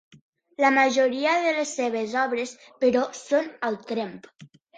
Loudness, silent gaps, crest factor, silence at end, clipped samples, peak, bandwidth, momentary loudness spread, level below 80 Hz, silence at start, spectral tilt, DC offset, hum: -24 LUFS; none; 20 dB; 0.3 s; under 0.1%; -6 dBFS; 9.4 kHz; 11 LU; -72 dBFS; 0.6 s; -3 dB/octave; under 0.1%; none